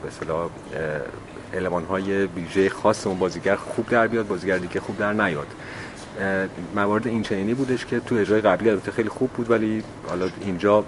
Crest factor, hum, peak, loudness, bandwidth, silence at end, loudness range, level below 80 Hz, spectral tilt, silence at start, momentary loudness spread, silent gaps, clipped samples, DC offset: 20 dB; none; -4 dBFS; -24 LUFS; 11.5 kHz; 0 s; 3 LU; -50 dBFS; -6 dB/octave; 0 s; 11 LU; none; under 0.1%; under 0.1%